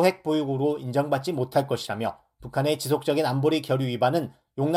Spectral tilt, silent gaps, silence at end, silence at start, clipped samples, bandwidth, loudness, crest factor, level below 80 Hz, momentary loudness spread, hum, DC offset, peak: -6 dB/octave; none; 0 s; 0 s; under 0.1%; 16 kHz; -26 LUFS; 18 dB; -62 dBFS; 7 LU; none; under 0.1%; -6 dBFS